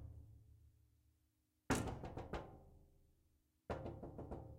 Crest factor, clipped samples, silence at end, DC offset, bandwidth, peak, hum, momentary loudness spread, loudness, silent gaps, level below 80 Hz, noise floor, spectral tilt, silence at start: 26 dB; under 0.1%; 0 s; under 0.1%; 15.5 kHz; -24 dBFS; none; 22 LU; -47 LUFS; none; -60 dBFS; -82 dBFS; -5.5 dB/octave; 0 s